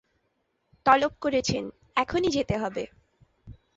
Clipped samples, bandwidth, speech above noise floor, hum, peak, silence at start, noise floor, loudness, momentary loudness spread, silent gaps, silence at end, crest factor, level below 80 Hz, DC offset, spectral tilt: under 0.1%; 8 kHz; 49 dB; none; -6 dBFS; 0.85 s; -74 dBFS; -26 LUFS; 11 LU; none; 0.25 s; 22 dB; -52 dBFS; under 0.1%; -4.5 dB/octave